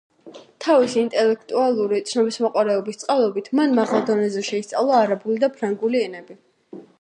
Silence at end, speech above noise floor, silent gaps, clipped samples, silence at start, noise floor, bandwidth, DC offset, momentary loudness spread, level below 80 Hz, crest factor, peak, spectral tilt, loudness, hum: 0.2 s; 24 dB; none; under 0.1%; 0.25 s; -44 dBFS; 10.5 kHz; under 0.1%; 6 LU; -76 dBFS; 16 dB; -4 dBFS; -5 dB/octave; -20 LUFS; none